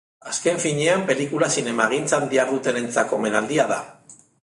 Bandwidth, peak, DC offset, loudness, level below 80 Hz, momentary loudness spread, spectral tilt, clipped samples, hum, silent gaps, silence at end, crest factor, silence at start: 11.5 kHz; -2 dBFS; under 0.1%; -21 LUFS; -68 dBFS; 4 LU; -3.5 dB/octave; under 0.1%; none; none; 0.35 s; 20 dB; 0.25 s